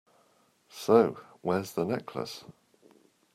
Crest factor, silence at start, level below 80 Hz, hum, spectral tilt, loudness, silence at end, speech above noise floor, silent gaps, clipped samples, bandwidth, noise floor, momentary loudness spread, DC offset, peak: 24 dB; 0.75 s; -74 dBFS; none; -6 dB/octave; -29 LUFS; 0.85 s; 39 dB; none; under 0.1%; 15.5 kHz; -67 dBFS; 17 LU; under 0.1%; -8 dBFS